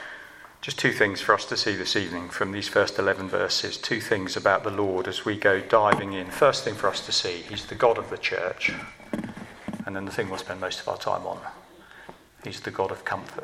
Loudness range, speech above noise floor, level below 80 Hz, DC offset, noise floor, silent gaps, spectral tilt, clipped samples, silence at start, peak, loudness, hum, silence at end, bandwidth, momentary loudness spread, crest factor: 9 LU; 23 dB; -60 dBFS; under 0.1%; -49 dBFS; none; -3.5 dB/octave; under 0.1%; 0 s; -4 dBFS; -26 LUFS; none; 0 s; 15.5 kHz; 15 LU; 24 dB